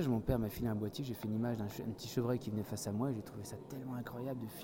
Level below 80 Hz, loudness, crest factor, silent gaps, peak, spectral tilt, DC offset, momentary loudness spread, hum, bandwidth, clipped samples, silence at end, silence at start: -56 dBFS; -40 LUFS; 20 dB; none; -20 dBFS; -6.5 dB/octave; under 0.1%; 8 LU; none; 17 kHz; under 0.1%; 0 s; 0 s